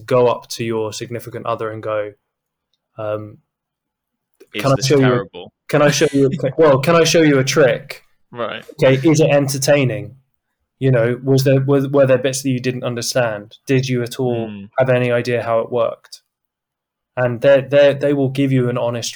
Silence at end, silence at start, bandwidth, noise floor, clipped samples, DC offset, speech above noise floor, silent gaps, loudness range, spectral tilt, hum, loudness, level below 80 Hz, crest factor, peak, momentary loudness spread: 0 s; 0 s; over 20 kHz; -81 dBFS; under 0.1%; under 0.1%; 66 dB; none; 10 LU; -5.5 dB/octave; none; -16 LUFS; -56 dBFS; 14 dB; -2 dBFS; 14 LU